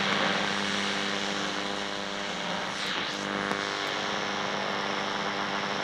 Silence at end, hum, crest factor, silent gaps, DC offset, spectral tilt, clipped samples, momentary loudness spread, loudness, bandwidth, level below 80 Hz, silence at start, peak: 0 s; none; 20 dB; none; under 0.1%; -3 dB/octave; under 0.1%; 4 LU; -29 LUFS; 15.5 kHz; -64 dBFS; 0 s; -10 dBFS